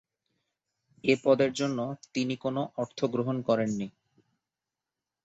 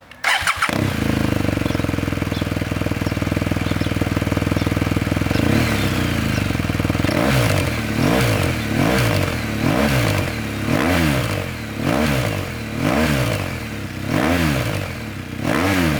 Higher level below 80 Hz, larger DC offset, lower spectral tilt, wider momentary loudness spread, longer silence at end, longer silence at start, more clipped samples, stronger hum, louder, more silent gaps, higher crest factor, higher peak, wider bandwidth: second, -70 dBFS vs -32 dBFS; neither; about the same, -6 dB/octave vs -5.5 dB/octave; first, 10 LU vs 7 LU; first, 1.35 s vs 0 s; first, 1.05 s vs 0.1 s; neither; neither; second, -29 LUFS vs -20 LUFS; neither; about the same, 20 dB vs 16 dB; second, -10 dBFS vs -4 dBFS; second, 8.2 kHz vs over 20 kHz